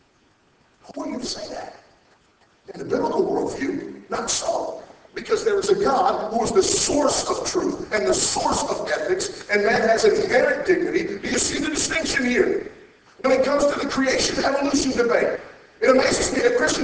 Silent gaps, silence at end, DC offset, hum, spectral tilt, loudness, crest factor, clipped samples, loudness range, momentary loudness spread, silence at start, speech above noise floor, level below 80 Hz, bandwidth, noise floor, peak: none; 0 s; under 0.1%; none; -2.5 dB/octave; -21 LUFS; 18 dB; under 0.1%; 7 LU; 13 LU; 0.9 s; 39 dB; -48 dBFS; 8 kHz; -60 dBFS; -4 dBFS